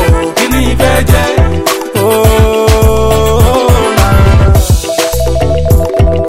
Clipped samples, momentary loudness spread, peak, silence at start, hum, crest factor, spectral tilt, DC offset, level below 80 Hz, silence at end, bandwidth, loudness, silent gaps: 1%; 4 LU; 0 dBFS; 0 s; none; 8 dB; -5.5 dB/octave; 6%; -12 dBFS; 0 s; 16.5 kHz; -9 LUFS; none